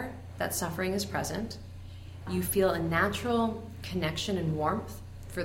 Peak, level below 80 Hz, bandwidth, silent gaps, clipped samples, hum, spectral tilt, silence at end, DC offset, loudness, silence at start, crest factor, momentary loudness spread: -12 dBFS; -50 dBFS; 16.5 kHz; none; under 0.1%; none; -4.5 dB/octave; 0 s; under 0.1%; -31 LUFS; 0 s; 18 dB; 17 LU